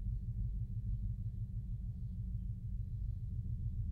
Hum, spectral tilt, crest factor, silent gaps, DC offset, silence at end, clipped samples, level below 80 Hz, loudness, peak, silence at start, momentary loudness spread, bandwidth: none; -11 dB/octave; 10 dB; none; under 0.1%; 0 s; under 0.1%; -42 dBFS; -43 LUFS; -30 dBFS; 0 s; 3 LU; 0.8 kHz